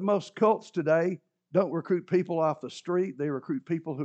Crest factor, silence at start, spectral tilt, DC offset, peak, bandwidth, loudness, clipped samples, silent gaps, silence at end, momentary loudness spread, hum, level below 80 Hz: 18 dB; 0 s; -7.5 dB/octave; under 0.1%; -10 dBFS; 8.6 kHz; -28 LUFS; under 0.1%; none; 0 s; 7 LU; none; -86 dBFS